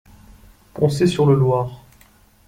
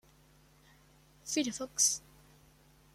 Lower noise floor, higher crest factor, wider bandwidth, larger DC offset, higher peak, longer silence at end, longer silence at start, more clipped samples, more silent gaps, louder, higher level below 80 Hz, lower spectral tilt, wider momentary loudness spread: second, -52 dBFS vs -63 dBFS; second, 16 dB vs 26 dB; about the same, 15 kHz vs 16 kHz; neither; first, -4 dBFS vs -14 dBFS; second, 0.7 s vs 0.95 s; second, 0.75 s vs 1.25 s; neither; neither; first, -18 LUFS vs -31 LUFS; first, -48 dBFS vs -68 dBFS; first, -7.5 dB/octave vs -1 dB/octave; about the same, 13 LU vs 11 LU